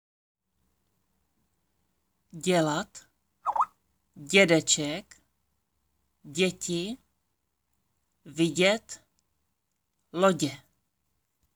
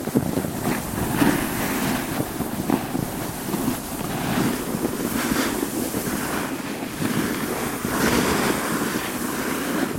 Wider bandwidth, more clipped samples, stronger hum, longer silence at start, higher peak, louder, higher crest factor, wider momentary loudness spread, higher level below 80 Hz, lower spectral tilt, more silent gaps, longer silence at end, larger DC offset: first, over 20 kHz vs 17 kHz; neither; neither; first, 2.35 s vs 0 s; about the same, -6 dBFS vs -4 dBFS; about the same, -26 LUFS vs -24 LUFS; about the same, 24 dB vs 20 dB; first, 20 LU vs 6 LU; second, -70 dBFS vs -44 dBFS; about the same, -3.5 dB/octave vs -4.5 dB/octave; neither; first, 1 s vs 0 s; neither